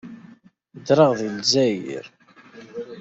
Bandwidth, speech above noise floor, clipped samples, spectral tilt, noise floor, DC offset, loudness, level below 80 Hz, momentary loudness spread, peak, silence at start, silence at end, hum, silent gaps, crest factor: 8 kHz; 31 dB; under 0.1%; -4.5 dB/octave; -51 dBFS; under 0.1%; -19 LUFS; -66 dBFS; 21 LU; -4 dBFS; 0.05 s; 0 s; none; none; 20 dB